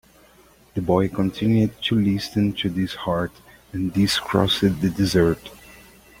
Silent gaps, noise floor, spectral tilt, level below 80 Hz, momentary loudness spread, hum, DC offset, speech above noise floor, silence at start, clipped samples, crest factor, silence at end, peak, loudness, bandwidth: none; -53 dBFS; -6 dB/octave; -46 dBFS; 10 LU; none; under 0.1%; 32 dB; 0.75 s; under 0.1%; 20 dB; 0.5 s; -2 dBFS; -22 LUFS; 16.5 kHz